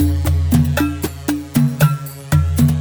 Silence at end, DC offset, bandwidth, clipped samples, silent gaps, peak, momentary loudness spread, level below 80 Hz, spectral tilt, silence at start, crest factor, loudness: 0 s; under 0.1%; over 20 kHz; under 0.1%; none; -2 dBFS; 8 LU; -26 dBFS; -6.5 dB/octave; 0 s; 14 dB; -17 LUFS